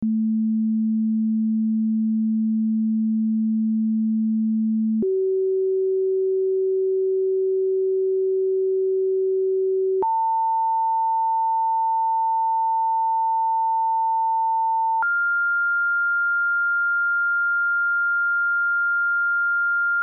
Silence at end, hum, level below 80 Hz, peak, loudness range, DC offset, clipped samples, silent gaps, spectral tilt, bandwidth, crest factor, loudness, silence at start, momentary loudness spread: 0 s; none; -74 dBFS; -18 dBFS; 2 LU; under 0.1%; under 0.1%; none; -13.5 dB/octave; 1.7 kHz; 4 dB; -21 LUFS; 0 s; 2 LU